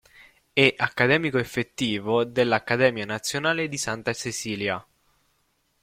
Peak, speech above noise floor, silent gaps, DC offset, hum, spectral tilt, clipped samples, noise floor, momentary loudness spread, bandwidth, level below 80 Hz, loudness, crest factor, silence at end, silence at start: -2 dBFS; 45 dB; none; under 0.1%; none; -4 dB/octave; under 0.1%; -70 dBFS; 9 LU; 16 kHz; -60 dBFS; -24 LUFS; 24 dB; 1 s; 0.55 s